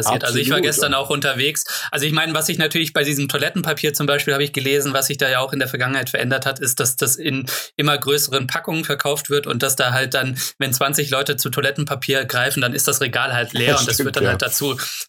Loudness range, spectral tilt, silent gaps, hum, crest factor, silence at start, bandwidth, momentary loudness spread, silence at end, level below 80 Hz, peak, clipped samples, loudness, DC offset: 1 LU; -3 dB/octave; none; none; 18 dB; 0 s; over 20 kHz; 4 LU; 0.05 s; -56 dBFS; -2 dBFS; under 0.1%; -18 LUFS; under 0.1%